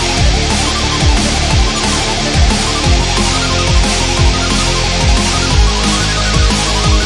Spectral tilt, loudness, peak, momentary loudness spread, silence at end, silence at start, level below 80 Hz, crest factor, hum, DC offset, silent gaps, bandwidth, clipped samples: -3.5 dB/octave; -12 LUFS; 0 dBFS; 1 LU; 0 s; 0 s; -16 dBFS; 12 dB; none; under 0.1%; none; 11.5 kHz; under 0.1%